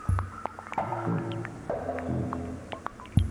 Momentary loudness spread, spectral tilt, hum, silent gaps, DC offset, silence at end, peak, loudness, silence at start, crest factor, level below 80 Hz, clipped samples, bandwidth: 8 LU; -7.5 dB/octave; none; none; under 0.1%; 0 s; -8 dBFS; -33 LUFS; 0 s; 24 dB; -42 dBFS; under 0.1%; 12 kHz